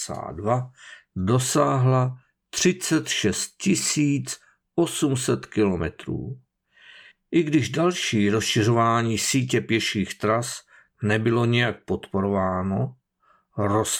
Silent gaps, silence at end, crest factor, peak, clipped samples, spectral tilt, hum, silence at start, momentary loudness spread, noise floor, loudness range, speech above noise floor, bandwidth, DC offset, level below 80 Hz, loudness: none; 0 s; 18 dB; -6 dBFS; under 0.1%; -4.5 dB/octave; none; 0 s; 11 LU; -64 dBFS; 3 LU; 41 dB; 19.5 kHz; under 0.1%; -54 dBFS; -23 LUFS